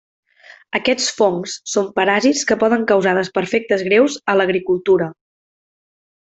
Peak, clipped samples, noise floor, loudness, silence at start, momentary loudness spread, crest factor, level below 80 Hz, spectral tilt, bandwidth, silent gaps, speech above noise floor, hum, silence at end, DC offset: -2 dBFS; under 0.1%; -46 dBFS; -17 LUFS; 0.75 s; 6 LU; 16 dB; -58 dBFS; -4 dB/octave; 8.4 kHz; none; 30 dB; none; 1.2 s; under 0.1%